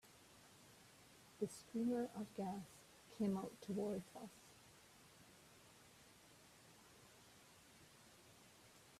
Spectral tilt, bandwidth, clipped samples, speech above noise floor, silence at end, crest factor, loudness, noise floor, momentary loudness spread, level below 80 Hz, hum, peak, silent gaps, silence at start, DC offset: -6 dB/octave; 15 kHz; under 0.1%; 22 dB; 0 s; 20 dB; -46 LUFS; -67 dBFS; 21 LU; -82 dBFS; none; -30 dBFS; none; 0.05 s; under 0.1%